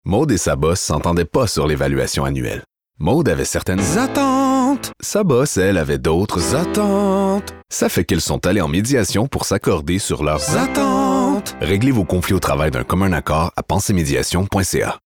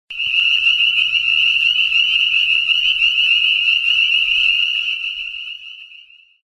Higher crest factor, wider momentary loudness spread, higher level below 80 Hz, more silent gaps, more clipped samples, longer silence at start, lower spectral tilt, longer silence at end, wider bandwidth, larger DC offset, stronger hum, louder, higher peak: about the same, 12 dB vs 14 dB; second, 4 LU vs 11 LU; first, -36 dBFS vs -56 dBFS; neither; neither; about the same, 0.05 s vs 0.1 s; first, -5 dB/octave vs 3 dB/octave; second, 0.1 s vs 0.5 s; first, 19 kHz vs 12 kHz; first, 0.4% vs under 0.1%; neither; second, -17 LUFS vs -13 LUFS; about the same, -4 dBFS vs -2 dBFS